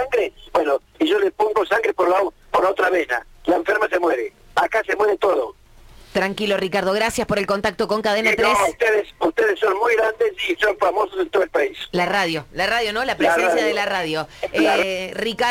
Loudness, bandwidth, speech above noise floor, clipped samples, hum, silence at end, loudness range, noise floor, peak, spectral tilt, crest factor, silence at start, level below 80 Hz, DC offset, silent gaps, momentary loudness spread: -20 LUFS; 17 kHz; 26 dB; under 0.1%; none; 0 s; 2 LU; -46 dBFS; -8 dBFS; -4 dB/octave; 12 dB; 0 s; -50 dBFS; under 0.1%; none; 6 LU